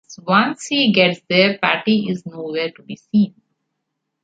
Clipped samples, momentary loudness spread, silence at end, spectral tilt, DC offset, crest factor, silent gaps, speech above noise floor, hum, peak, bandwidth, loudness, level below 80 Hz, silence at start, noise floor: under 0.1%; 12 LU; 0.95 s; -5 dB/octave; under 0.1%; 18 dB; none; 59 dB; none; -2 dBFS; 9.2 kHz; -18 LUFS; -64 dBFS; 0.1 s; -77 dBFS